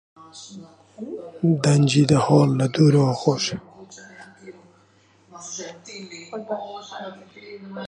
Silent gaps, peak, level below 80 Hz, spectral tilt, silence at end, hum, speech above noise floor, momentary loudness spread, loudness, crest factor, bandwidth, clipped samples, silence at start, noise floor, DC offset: none; -2 dBFS; -60 dBFS; -6 dB/octave; 0 s; none; 37 dB; 25 LU; -20 LUFS; 20 dB; 10.5 kHz; under 0.1%; 0.35 s; -57 dBFS; under 0.1%